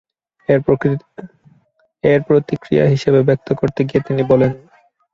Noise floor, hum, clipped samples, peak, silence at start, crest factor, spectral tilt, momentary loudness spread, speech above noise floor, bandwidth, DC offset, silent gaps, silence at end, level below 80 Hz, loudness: -59 dBFS; none; under 0.1%; 0 dBFS; 0.5 s; 16 dB; -8.5 dB/octave; 12 LU; 44 dB; 7.4 kHz; under 0.1%; none; 0.55 s; -48 dBFS; -16 LUFS